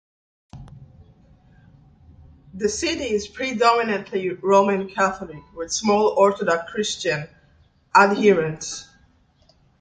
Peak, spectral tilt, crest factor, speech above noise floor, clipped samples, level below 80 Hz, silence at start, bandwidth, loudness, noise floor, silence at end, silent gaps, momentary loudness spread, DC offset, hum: -2 dBFS; -4 dB/octave; 22 dB; 38 dB; under 0.1%; -54 dBFS; 0.55 s; 9.4 kHz; -21 LUFS; -58 dBFS; 0.95 s; none; 14 LU; under 0.1%; none